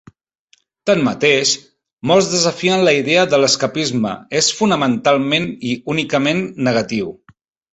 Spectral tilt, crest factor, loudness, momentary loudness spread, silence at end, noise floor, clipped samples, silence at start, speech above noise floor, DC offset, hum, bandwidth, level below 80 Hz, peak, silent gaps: -3.5 dB/octave; 16 dB; -16 LUFS; 9 LU; 0.6 s; -58 dBFS; under 0.1%; 0.85 s; 42 dB; under 0.1%; none; 8.4 kHz; -54 dBFS; 0 dBFS; 1.93-1.97 s